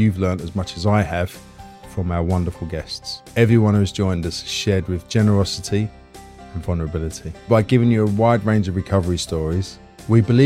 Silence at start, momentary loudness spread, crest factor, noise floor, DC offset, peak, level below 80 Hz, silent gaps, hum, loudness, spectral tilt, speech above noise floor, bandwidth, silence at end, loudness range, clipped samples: 0 s; 13 LU; 18 dB; -41 dBFS; under 0.1%; -2 dBFS; -42 dBFS; none; none; -20 LUFS; -6.5 dB/octave; 22 dB; 14 kHz; 0 s; 3 LU; under 0.1%